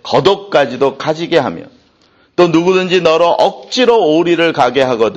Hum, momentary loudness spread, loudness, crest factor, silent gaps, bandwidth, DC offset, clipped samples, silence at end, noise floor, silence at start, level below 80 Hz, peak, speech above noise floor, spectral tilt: none; 5 LU; -12 LUFS; 12 dB; none; 8.4 kHz; under 0.1%; under 0.1%; 0 s; -51 dBFS; 0.05 s; -52 dBFS; 0 dBFS; 40 dB; -5 dB/octave